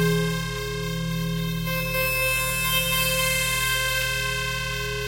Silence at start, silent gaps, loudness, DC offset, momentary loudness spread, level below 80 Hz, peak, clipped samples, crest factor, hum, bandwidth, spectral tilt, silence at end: 0 s; none; -23 LUFS; under 0.1%; 7 LU; -38 dBFS; -8 dBFS; under 0.1%; 16 dB; none; 16 kHz; -3 dB/octave; 0 s